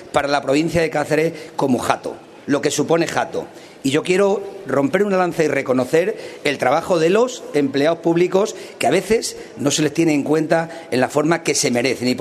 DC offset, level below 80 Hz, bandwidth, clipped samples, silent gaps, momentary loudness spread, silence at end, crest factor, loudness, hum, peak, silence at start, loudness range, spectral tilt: under 0.1%; -54 dBFS; 13.5 kHz; under 0.1%; none; 7 LU; 0 s; 18 dB; -19 LUFS; none; 0 dBFS; 0 s; 2 LU; -4.5 dB/octave